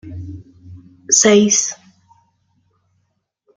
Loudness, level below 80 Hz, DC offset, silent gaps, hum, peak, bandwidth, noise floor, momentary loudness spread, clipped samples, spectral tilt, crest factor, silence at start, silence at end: -12 LUFS; -56 dBFS; under 0.1%; none; none; 0 dBFS; 10 kHz; -68 dBFS; 24 LU; under 0.1%; -2.5 dB/octave; 20 dB; 0.05 s; 1.85 s